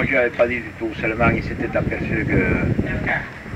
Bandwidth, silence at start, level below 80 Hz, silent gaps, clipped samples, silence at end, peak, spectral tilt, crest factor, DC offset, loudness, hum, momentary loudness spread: 11 kHz; 0 s; -34 dBFS; none; under 0.1%; 0 s; -4 dBFS; -8 dB/octave; 16 dB; under 0.1%; -21 LUFS; none; 6 LU